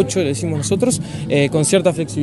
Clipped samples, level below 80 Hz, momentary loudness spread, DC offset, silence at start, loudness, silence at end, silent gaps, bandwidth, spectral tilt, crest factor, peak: under 0.1%; -48 dBFS; 5 LU; under 0.1%; 0 s; -17 LUFS; 0 s; none; 12 kHz; -5 dB/octave; 16 dB; -2 dBFS